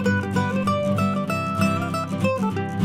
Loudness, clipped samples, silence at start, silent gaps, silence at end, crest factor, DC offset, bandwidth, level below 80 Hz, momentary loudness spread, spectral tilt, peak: -23 LUFS; under 0.1%; 0 s; none; 0 s; 16 dB; under 0.1%; 15 kHz; -56 dBFS; 3 LU; -6.5 dB/octave; -8 dBFS